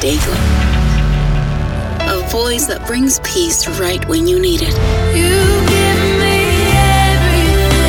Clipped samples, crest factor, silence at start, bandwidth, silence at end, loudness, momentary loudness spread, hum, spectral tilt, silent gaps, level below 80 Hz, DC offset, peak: under 0.1%; 12 dB; 0 s; over 20 kHz; 0 s; -13 LUFS; 6 LU; none; -4.5 dB/octave; none; -18 dBFS; under 0.1%; 0 dBFS